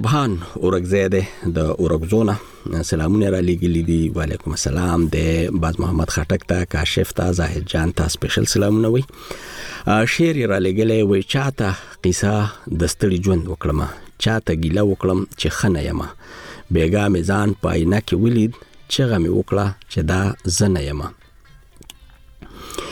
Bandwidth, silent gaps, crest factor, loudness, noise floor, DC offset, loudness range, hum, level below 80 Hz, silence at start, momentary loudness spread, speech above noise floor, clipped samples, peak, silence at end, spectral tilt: 18.5 kHz; none; 14 dB; -19 LUFS; -47 dBFS; under 0.1%; 2 LU; none; -32 dBFS; 0 s; 8 LU; 28 dB; under 0.1%; -6 dBFS; 0 s; -5.5 dB/octave